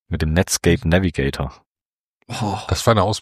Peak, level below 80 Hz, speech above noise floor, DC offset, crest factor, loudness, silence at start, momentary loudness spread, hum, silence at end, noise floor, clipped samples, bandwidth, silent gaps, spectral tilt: -2 dBFS; -34 dBFS; over 71 dB; under 0.1%; 18 dB; -19 LUFS; 0.1 s; 11 LU; none; 0 s; under -90 dBFS; under 0.1%; 15.5 kHz; 1.66-1.75 s, 1.85-2.20 s; -5 dB/octave